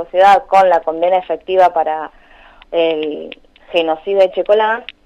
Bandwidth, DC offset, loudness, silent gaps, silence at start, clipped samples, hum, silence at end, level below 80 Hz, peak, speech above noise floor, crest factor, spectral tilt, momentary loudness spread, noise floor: 9.2 kHz; under 0.1%; -14 LUFS; none; 0 s; under 0.1%; none; 0.2 s; -52 dBFS; -2 dBFS; 29 dB; 12 dB; -4.5 dB/octave; 13 LU; -43 dBFS